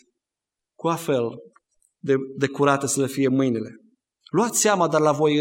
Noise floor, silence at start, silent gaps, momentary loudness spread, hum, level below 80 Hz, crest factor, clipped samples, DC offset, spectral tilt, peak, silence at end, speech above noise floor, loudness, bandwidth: -87 dBFS; 0.85 s; none; 10 LU; none; -70 dBFS; 20 dB; under 0.1%; under 0.1%; -4.5 dB/octave; -4 dBFS; 0 s; 66 dB; -22 LUFS; 16.5 kHz